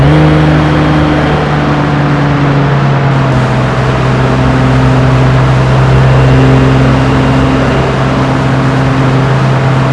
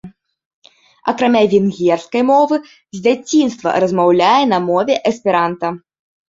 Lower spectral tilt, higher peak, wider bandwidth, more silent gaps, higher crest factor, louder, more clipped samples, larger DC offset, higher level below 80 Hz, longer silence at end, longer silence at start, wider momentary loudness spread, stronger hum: first, -7.5 dB/octave vs -5.5 dB/octave; about the same, 0 dBFS vs -2 dBFS; first, 9.8 kHz vs 7.8 kHz; second, none vs 0.45-0.62 s; second, 8 dB vs 14 dB; first, -8 LUFS vs -15 LUFS; first, 2% vs under 0.1%; neither; first, -20 dBFS vs -60 dBFS; second, 0 s vs 0.5 s; about the same, 0 s vs 0.05 s; second, 4 LU vs 10 LU; neither